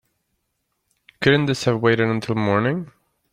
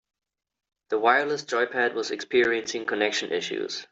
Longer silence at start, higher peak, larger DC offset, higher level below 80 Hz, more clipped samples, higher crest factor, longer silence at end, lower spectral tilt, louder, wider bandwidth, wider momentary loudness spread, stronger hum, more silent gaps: first, 1.2 s vs 0.9 s; first, -2 dBFS vs -6 dBFS; neither; first, -56 dBFS vs -72 dBFS; neither; about the same, 20 dB vs 20 dB; first, 0.45 s vs 0.05 s; first, -6 dB/octave vs -2.5 dB/octave; first, -20 LUFS vs -25 LUFS; first, 12.5 kHz vs 8 kHz; about the same, 7 LU vs 9 LU; neither; neither